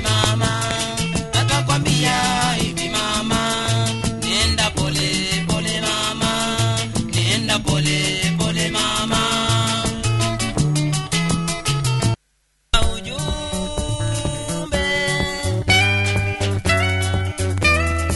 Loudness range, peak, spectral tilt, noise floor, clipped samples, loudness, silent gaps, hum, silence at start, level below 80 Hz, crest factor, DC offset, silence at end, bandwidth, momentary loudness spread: 3 LU; 0 dBFS; -3.5 dB/octave; -64 dBFS; under 0.1%; -19 LUFS; none; none; 0 s; -32 dBFS; 20 dB; under 0.1%; 0 s; 12 kHz; 6 LU